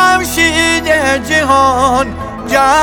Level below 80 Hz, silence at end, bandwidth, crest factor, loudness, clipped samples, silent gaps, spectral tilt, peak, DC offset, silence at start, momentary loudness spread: -34 dBFS; 0 s; over 20 kHz; 10 dB; -11 LUFS; under 0.1%; none; -3 dB/octave; 0 dBFS; under 0.1%; 0 s; 6 LU